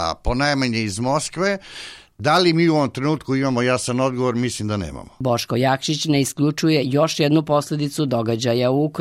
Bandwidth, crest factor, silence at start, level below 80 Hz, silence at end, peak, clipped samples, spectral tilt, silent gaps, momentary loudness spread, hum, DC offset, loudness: 16 kHz; 14 dB; 0 s; -40 dBFS; 0 s; -6 dBFS; under 0.1%; -5 dB/octave; none; 8 LU; none; under 0.1%; -20 LUFS